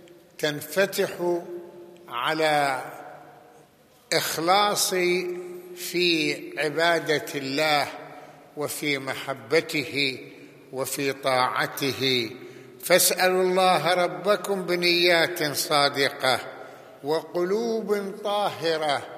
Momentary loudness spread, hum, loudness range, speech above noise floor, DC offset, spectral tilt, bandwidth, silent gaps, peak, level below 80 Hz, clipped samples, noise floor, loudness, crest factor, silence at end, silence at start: 17 LU; none; 6 LU; 32 dB; under 0.1%; -3 dB/octave; 15 kHz; none; -4 dBFS; -78 dBFS; under 0.1%; -56 dBFS; -24 LUFS; 22 dB; 0 s; 0.05 s